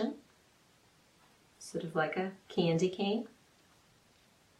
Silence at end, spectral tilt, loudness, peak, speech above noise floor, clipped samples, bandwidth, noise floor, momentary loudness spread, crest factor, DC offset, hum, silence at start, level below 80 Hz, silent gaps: 1.3 s; -6 dB/octave; -34 LUFS; -18 dBFS; 33 dB; under 0.1%; 12.5 kHz; -66 dBFS; 18 LU; 20 dB; under 0.1%; none; 0 s; -76 dBFS; none